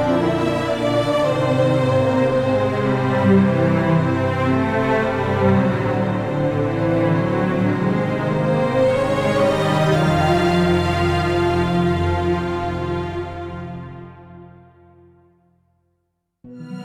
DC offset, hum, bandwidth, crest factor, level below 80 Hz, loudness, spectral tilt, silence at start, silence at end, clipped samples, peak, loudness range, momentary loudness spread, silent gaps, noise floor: under 0.1%; none; 14 kHz; 16 dB; -40 dBFS; -19 LUFS; -7.5 dB/octave; 0 s; 0 s; under 0.1%; -4 dBFS; 9 LU; 7 LU; none; -73 dBFS